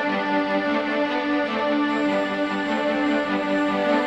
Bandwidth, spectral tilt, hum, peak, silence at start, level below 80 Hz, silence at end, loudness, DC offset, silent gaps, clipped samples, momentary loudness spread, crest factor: 8.4 kHz; -5.5 dB/octave; none; -10 dBFS; 0 s; -58 dBFS; 0 s; -23 LUFS; under 0.1%; none; under 0.1%; 2 LU; 12 dB